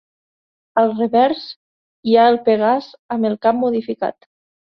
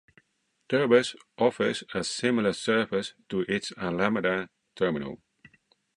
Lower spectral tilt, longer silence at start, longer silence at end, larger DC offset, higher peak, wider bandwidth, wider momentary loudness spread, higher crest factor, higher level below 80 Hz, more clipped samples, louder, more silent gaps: first, -8 dB/octave vs -4.5 dB/octave; about the same, 0.75 s vs 0.7 s; second, 0.6 s vs 0.8 s; neither; first, -2 dBFS vs -6 dBFS; second, 5.8 kHz vs 11.5 kHz; about the same, 13 LU vs 11 LU; second, 16 dB vs 22 dB; about the same, -64 dBFS vs -64 dBFS; neither; first, -17 LUFS vs -27 LUFS; first, 1.56-2.03 s, 2.99-3.09 s vs none